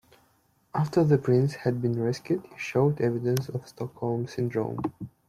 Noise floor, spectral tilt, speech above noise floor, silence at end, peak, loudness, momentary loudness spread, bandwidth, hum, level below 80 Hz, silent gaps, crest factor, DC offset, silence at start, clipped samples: -66 dBFS; -8 dB/octave; 40 dB; 0.2 s; -10 dBFS; -27 LUFS; 11 LU; 14.5 kHz; none; -62 dBFS; none; 18 dB; under 0.1%; 0.75 s; under 0.1%